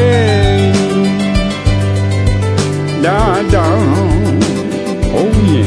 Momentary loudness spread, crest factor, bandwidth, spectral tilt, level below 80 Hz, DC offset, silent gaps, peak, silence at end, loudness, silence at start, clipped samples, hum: 4 LU; 10 dB; 11 kHz; -6.5 dB/octave; -22 dBFS; under 0.1%; none; 0 dBFS; 0 s; -12 LUFS; 0 s; under 0.1%; none